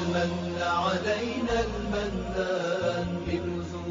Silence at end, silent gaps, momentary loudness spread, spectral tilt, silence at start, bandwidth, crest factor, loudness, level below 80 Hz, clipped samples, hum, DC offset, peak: 0 s; none; 4 LU; -4.5 dB/octave; 0 s; 7.4 kHz; 14 dB; -29 LUFS; -44 dBFS; under 0.1%; none; under 0.1%; -14 dBFS